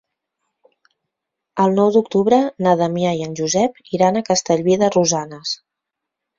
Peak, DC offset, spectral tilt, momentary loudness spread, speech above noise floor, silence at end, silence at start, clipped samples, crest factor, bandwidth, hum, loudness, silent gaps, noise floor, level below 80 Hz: -2 dBFS; under 0.1%; -5 dB/octave; 10 LU; 65 dB; 0.85 s; 1.55 s; under 0.1%; 18 dB; 7.6 kHz; none; -17 LUFS; none; -82 dBFS; -60 dBFS